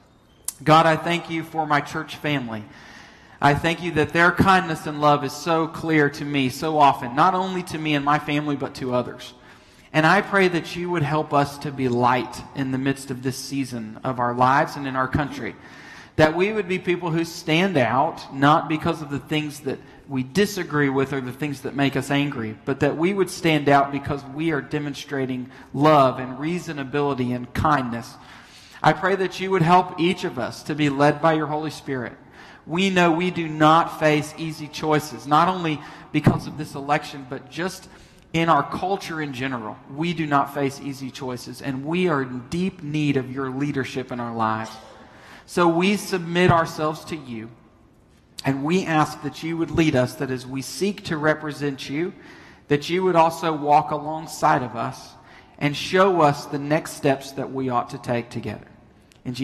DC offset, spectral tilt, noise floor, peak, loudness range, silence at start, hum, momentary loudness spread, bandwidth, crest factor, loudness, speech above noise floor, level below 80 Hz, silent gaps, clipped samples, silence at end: under 0.1%; -5.5 dB/octave; -54 dBFS; -4 dBFS; 4 LU; 0.5 s; none; 13 LU; 13 kHz; 20 dB; -22 LUFS; 32 dB; -52 dBFS; none; under 0.1%; 0 s